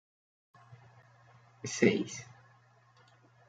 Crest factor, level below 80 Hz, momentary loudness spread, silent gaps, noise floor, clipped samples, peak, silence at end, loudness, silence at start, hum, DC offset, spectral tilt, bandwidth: 26 dB; -78 dBFS; 18 LU; none; -64 dBFS; under 0.1%; -10 dBFS; 1.25 s; -32 LUFS; 0.7 s; none; under 0.1%; -4.5 dB/octave; 9.4 kHz